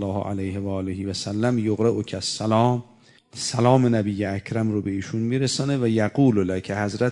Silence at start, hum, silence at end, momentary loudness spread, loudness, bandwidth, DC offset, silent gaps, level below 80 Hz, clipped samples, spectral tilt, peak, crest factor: 0 s; none; 0 s; 9 LU; -23 LUFS; 11 kHz; under 0.1%; none; -60 dBFS; under 0.1%; -6 dB/octave; -2 dBFS; 20 dB